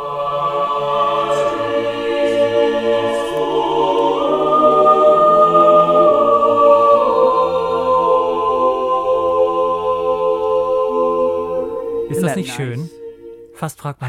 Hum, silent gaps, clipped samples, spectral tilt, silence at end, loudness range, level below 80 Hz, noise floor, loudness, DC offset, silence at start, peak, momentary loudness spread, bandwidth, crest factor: none; none; under 0.1%; -6 dB/octave; 0 s; 7 LU; -50 dBFS; -37 dBFS; -15 LUFS; under 0.1%; 0 s; 0 dBFS; 11 LU; 14.5 kHz; 14 dB